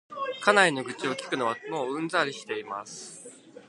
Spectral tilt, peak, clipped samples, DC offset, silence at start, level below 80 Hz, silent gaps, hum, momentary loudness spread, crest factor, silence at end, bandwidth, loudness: -3 dB/octave; -4 dBFS; under 0.1%; under 0.1%; 0.1 s; -80 dBFS; none; none; 19 LU; 26 dB; 0.05 s; 11.5 kHz; -27 LUFS